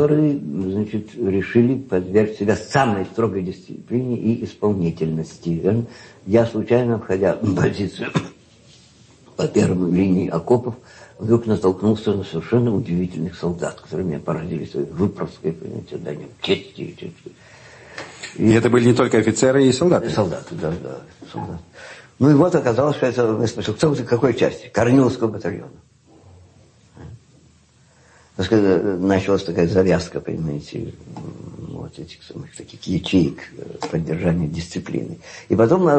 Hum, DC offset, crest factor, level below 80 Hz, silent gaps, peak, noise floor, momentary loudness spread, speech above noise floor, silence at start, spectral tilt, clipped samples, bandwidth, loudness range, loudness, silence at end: none; under 0.1%; 16 dB; -50 dBFS; none; -4 dBFS; -54 dBFS; 19 LU; 34 dB; 0 s; -7 dB/octave; under 0.1%; 8.8 kHz; 8 LU; -20 LUFS; 0 s